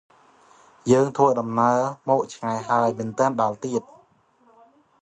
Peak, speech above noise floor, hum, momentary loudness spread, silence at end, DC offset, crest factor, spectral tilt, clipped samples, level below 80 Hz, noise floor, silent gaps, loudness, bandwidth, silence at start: -4 dBFS; 38 dB; none; 9 LU; 1.25 s; under 0.1%; 20 dB; -6.5 dB/octave; under 0.1%; -66 dBFS; -59 dBFS; none; -22 LUFS; 10.5 kHz; 0.85 s